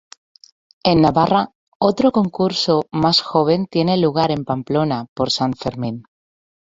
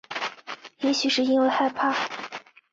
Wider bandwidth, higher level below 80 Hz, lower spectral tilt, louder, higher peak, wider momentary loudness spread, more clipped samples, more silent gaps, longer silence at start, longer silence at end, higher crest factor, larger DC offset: about the same, 7.8 kHz vs 7.8 kHz; first, -50 dBFS vs -72 dBFS; first, -6 dB/octave vs -2.5 dB/octave; first, -18 LUFS vs -24 LUFS; first, -2 dBFS vs -10 dBFS; second, 9 LU vs 17 LU; neither; first, 1.55-1.80 s, 5.09-5.16 s vs none; first, 0.85 s vs 0.1 s; first, 0.7 s vs 0.35 s; about the same, 16 dB vs 16 dB; neither